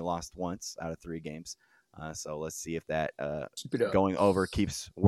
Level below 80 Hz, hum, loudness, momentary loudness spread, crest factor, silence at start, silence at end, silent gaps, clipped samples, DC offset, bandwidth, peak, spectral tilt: -54 dBFS; none; -33 LUFS; 15 LU; 22 dB; 0 s; 0 s; none; under 0.1%; under 0.1%; 15 kHz; -10 dBFS; -5.5 dB/octave